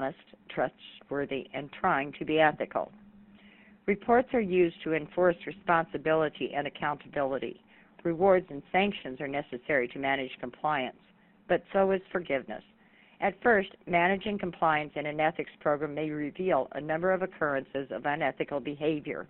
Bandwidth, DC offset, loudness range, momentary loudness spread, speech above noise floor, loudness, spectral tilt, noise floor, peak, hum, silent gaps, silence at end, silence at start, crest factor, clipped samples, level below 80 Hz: 4.2 kHz; under 0.1%; 3 LU; 10 LU; 28 dB; -30 LUFS; -4 dB/octave; -58 dBFS; -10 dBFS; none; none; 0.05 s; 0 s; 20 dB; under 0.1%; -62 dBFS